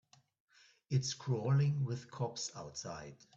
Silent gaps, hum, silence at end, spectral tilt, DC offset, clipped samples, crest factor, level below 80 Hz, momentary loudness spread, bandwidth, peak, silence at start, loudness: none; none; 0.2 s; -5.5 dB/octave; under 0.1%; under 0.1%; 16 dB; -72 dBFS; 13 LU; 8 kHz; -22 dBFS; 0.9 s; -37 LUFS